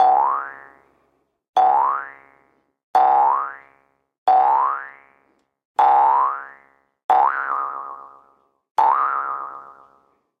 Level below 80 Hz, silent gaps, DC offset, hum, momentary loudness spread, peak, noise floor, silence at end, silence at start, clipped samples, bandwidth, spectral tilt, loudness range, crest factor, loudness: -74 dBFS; 1.49-1.53 s, 2.83-2.94 s, 4.18-4.26 s, 5.65-5.75 s, 7.04-7.09 s, 8.71-8.75 s; under 0.1%; none; 19 LU; -4 dBFS; -66 dBFS; 0.7 s; 0 s; under 0.1%; 6.6 kHz; -3 dB/octave; 3 LU; 16 dB; -19 LUFS